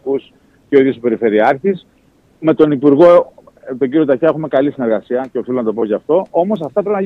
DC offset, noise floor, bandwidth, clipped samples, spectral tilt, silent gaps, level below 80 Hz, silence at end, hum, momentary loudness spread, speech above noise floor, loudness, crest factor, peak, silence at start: under 0.1%; -51 dBFS; 6 kHz; under 0.1%; -9 dB/octave; none; -56 dBFS; 0 s; none; 11 LU; 39 dB; -14 LUFS; 14 dB; 0 dBFS; 0.05 s